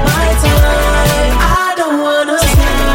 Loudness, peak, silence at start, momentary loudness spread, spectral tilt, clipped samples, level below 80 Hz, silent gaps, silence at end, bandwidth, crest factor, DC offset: -11 LUFS; 0 dBFS; 0 s; 2 LU; -4.5 dB/octave; under 0.1%; -14 dBFS; none; 0 s; 17 kHz; 10 dB; under 0.1%